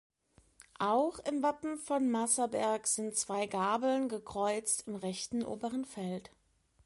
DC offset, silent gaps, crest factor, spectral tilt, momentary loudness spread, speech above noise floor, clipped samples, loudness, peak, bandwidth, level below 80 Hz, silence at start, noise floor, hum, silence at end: under 0.1%; none; 18 dB; -3.5 dB/octave; 8 LU; 31 dB; under 0.1%; -34 LUFS; -18 dBFS; 11.5 kHz; -70 dBFS; 0.8 s; -64 dBFS; none; 0.65 s